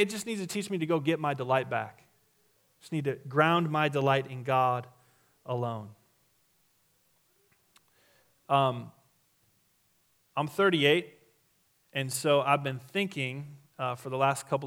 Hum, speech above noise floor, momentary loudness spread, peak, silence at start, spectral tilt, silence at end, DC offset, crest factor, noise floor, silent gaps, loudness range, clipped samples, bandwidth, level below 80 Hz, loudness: none; 41 dB; 13 LU; -8 dBFS; 0 s; -5 dB/octave; 0 s; under 0.1%; 24 dB; -70 dBFS; none; 7 LU; under 0.1%; 17.5 kHz; -78 dBFS; -29 LUFS